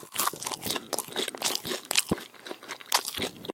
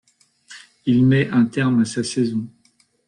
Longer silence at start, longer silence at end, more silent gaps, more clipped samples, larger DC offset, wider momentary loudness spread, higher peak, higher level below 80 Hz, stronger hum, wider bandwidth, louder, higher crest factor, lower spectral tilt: second, 0 s vs 0.5 s; second, 0 s vs 0.6 s; neither; neither; neither; about the same, 13 LU vs 12 LU; first, -2 dBFS vs -6 dBFS; about the same, -60 dBFS vs -56 dBFS; neither; first, 17 kHz vs 10.5 kHz; second, -29 LUFS vs -19 LUFS; first, 30 dB vs 14 dB; second, -1.5 dB/octave vs -6.5 dB/octave